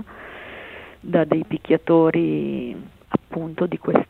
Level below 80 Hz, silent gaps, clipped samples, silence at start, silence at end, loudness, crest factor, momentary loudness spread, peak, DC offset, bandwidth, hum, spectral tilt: -54 dBFS; none; under 0.1%; 0 s; 0.05 s; -21 LUFS; 22 dB; 21 LU; 0 dBFS; under 0.1%; 4.2 kHz; none; -9.5 dB/octave